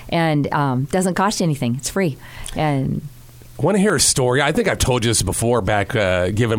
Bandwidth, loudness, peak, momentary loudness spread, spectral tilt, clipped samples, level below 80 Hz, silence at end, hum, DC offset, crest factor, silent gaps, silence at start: 17 kHz; -18 LUFS; -4 dBFS; 8 LU; -4.5 dB/octave; under 0.1%; -38 dBFS; 0 s; none; under 0.1%; 14 dB; none; 0 s